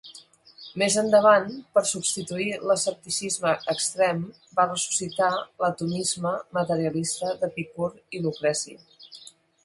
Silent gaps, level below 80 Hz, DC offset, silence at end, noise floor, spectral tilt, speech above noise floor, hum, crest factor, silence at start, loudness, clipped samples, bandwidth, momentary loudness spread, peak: none; -68 dBFS; under 0.1%; 0.35 s; -50 dBFS; -3.5 dB/octave; 25 dB; none; 22 dB; 0.05 s; -25 LUFS; under 0.1%; 11.5 kHz; 11 LU; -4 dBFS